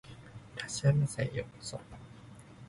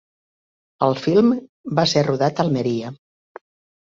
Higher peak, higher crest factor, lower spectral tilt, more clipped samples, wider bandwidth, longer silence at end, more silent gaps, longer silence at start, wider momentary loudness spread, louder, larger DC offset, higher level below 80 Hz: second, -14 dBFS vs -2 dBFS; about the same, 22 dB vs 20 dB; about the same, -5.5 dB/octave vs -6 dB/octave; neither; first, 11.5 kHz vs 7.8 kHz; second, 0 s vs 0.9 s; second, none vs 1.49-1.64 s; second, 0.05 s vs 0.8 s; first, 23 LU vs 9 LU; second, -33 LUFS vs -20 LUFS; neither; about the same, -58 dBFS vs -60 dBFS